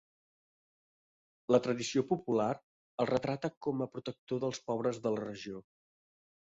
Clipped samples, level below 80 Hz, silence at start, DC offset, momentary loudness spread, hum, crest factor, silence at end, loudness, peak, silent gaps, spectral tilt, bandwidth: under 0.1%; -72 dBFS; 1.5 s; under 0.1%; 14 LU; none; 22 dB; 0.85 s; -34 LUFS; -14 dBFS; 2.63-2.98 s, 3.57-3.61 s, 4.18-4.27 s; -5.5 dB/octave; 8 kHz